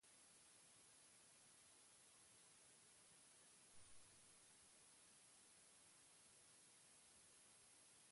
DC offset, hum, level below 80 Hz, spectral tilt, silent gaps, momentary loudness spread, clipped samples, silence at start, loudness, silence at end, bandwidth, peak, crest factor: under 0.1%; none; under -90 dBFS; -0.5 dB/octave; none; 1 LU; under 0.1%; 0 s; -68 LUFS; 0 s; 11.5 kHz; -54 dBFS; 16 dB